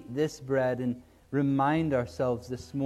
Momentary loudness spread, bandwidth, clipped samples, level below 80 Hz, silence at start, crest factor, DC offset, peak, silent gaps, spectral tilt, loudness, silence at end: 9 LU; 13.5 kHz; under 0.1%; -60 dBFS; 0 s; 14 dB; under 0.1%; -14 dBFS; none; -7.5 dB/octave; -29 LUFS; 0 s